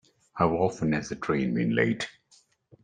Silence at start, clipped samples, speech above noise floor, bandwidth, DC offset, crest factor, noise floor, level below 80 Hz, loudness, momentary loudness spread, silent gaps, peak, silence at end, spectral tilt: 0.35 s; under 0.1%; 37 dB; 9.6 kHz; under 0.1%; 20 dB; -63 dBFS; -58 dBFS; -27 LUFS; 8 LU; none; -8 dBFS; 0.75 s; -6.5 dB/octave